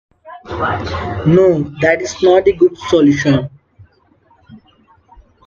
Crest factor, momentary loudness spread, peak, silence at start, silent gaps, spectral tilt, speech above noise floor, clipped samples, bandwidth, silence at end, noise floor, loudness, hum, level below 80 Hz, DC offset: 16 dB; 10 LU; 0 dBFS; 0.25 s; none; -6.5 dB/octave; 40 dB; under 0.1%; 7.4 kHz; 0.9 s; -53 dBFS; -13 LUFS; none; -44 dBFS; under 0.1%